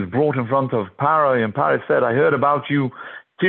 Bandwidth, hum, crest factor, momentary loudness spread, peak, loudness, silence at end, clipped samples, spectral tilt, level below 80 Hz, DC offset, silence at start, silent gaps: 4.2 kHz; none; 14 dB; 7 LU; -4 dBFS; -19 LUFS; 0 s; under 0.1%; -10.5 dB/octave; -56 dBFS; under 0.1%; 0 s; none